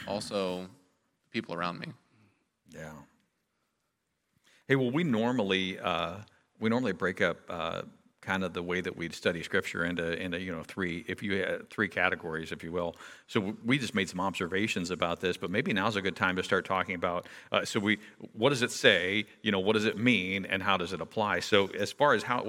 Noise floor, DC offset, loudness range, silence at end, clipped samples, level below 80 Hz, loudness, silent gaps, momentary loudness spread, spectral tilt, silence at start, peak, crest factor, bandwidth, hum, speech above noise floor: -80 dBFS; under 0.1%; 9 LU; 0 s; under 0.1%; -66 dBFS; -30 LUFS; none; 11 LU; -4.5 dB/octave; 0 s; -8 dBFS; 24 dB; 16.5 kHz; none; 50 dB